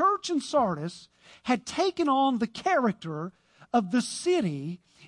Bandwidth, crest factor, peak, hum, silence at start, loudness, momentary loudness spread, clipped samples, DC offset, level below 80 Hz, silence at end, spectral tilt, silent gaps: 11.5 kHz; 16 dB; -12 dBFS; none; 0 s; -27 LUFS; 13 LU; under 0.1%; under 0.1%; -68 dBFS; 0 s; -5 dB/octave; none